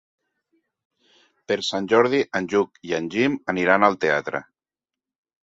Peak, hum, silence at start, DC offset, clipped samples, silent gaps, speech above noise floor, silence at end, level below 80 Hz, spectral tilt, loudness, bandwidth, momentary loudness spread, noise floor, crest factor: -2 dBFS; none; 1.5 s; under 0.1%; under 0.1%; none; 68 dB; 1 s; -64 dBFS; -5 dB/octave; -21 LUFS; 8 kHz; 10 LU; -90 dBFS; 22 dB